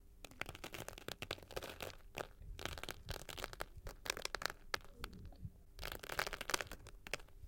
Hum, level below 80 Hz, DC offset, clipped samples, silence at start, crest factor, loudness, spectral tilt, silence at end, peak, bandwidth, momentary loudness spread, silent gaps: none; -56 dBFS; under 0.1%; under 0.1%; 0 s; 36 dB; -47 LUFS; -2.5 dB/octave; 0 s; -10 dBFS; 17 kHz; 11 LU; none